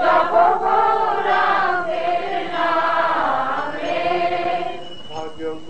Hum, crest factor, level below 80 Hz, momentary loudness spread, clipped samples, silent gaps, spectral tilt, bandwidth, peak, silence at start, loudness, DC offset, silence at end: none; 16 dB; -56 dBFS; 13 LU; under 0.1%; none; -4.5 dB/octave; 8.8 kHz; -4 dBFS; 0 s; -19 LUFS; 3%; 0 s